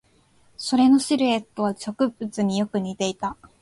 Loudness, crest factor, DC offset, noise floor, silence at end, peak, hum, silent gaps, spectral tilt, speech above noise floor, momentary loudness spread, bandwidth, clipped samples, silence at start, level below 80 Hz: -23 LUFS; 16 dB; under 0.1%; -59 dBFS; 0.3 s; -8 dBFS; none; none; -5 dB/octave; 37 dB; 10 LU; 11.5 kHz; under 0.1%; 0.6 s; -60 dBFS